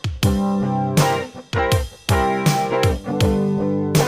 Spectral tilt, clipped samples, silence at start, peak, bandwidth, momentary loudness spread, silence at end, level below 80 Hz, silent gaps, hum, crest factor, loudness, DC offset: -5.5 dB/octave; under 0.1%; 0.05 s; -2 dBFS; 15.5 kHz; 4 LU; 0 s; -32 dBFS; none; none; 16 dB; -20 LUFS; under 0.1%